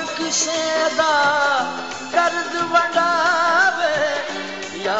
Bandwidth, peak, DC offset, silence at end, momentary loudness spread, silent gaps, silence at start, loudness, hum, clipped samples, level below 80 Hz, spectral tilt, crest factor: 8.2 kHz; -4 dBFS; 0.4%; 0 s; 10 LU; none; 0 s; -18 LUFS; none; under 0.1%; -64 dBFS; -1.5 dB/octave; 16 dB